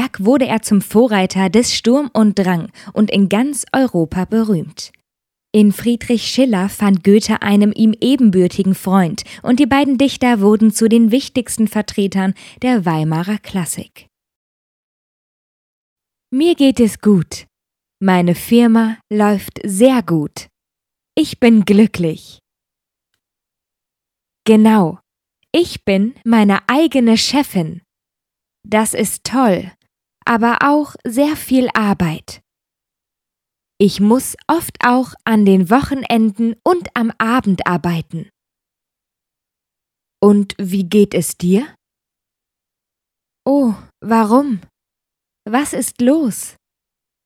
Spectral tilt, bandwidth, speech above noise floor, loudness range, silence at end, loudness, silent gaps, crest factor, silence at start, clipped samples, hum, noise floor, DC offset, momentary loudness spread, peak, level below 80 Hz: -5.5 dB/octave; 16 kHz; 70 dB; 6 LU; 0.75 s; -14 LUFS; 14.36-15.96 s; 16 dB; 0 s; under 0.1%; none; -83 dBFS; under 0.1%; 9 LU; 0 dBFS; -50 dBFS